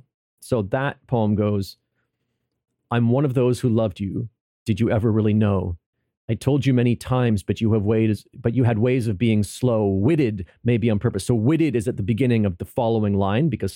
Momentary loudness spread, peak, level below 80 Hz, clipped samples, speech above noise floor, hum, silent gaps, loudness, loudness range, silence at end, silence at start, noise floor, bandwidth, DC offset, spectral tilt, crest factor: 7 LU; -6 dBFS; -50 dBFS; under 0.1%; 56 dB; none; 4.40-4.66 s, 5.86-5.93 s, 6.17-6.28 s; -21 LUFS; 3 LU; 0 s; 0.4 s; -76 dBFS; 15.5 kHz; under 0.1%; -8 dB/octave; 14 dB